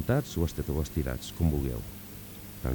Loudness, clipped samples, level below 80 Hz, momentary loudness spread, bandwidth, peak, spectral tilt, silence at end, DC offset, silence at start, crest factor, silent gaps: -32 LUFS; under 0.1%; -38 dBFS; 14 LU; 19 kHz; -14 dBFS; -6.5 dB/octave; 0 s; under 0.1%; 0 s; 18 dB; none